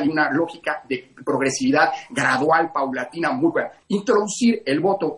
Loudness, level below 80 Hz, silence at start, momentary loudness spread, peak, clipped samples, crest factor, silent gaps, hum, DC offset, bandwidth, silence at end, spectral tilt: -21 LUFS; -64 dBFS; 0 s; 8 LU; -4 dBFS; under 0.1%; 16 dB; none; none; under 0.1%; 11.5 kHz; 0 s; -4.5 dB/octave